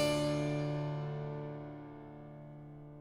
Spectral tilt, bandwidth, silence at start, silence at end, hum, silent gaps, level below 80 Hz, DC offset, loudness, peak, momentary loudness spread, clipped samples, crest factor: -6 dB/octave; 16 kHz; 0 s; 0 s; none; none; -62 dBFS; under 0.1%; -38 LUFS; -20 dBFS; 17 LU; under 0.1%; 18 dB